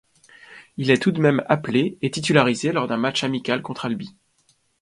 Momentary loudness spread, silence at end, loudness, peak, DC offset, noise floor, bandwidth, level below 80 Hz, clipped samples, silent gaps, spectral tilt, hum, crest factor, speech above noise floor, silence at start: 10 LU; 0.7 s; -21 LUFS; 0 dBFS; under 0.1%; -64 dBFS; 11.5 kHz; -62 dBFS; under 0.1%; none; -5.5 dB/octave; none; 22 dB; 43 dB; 0.5 s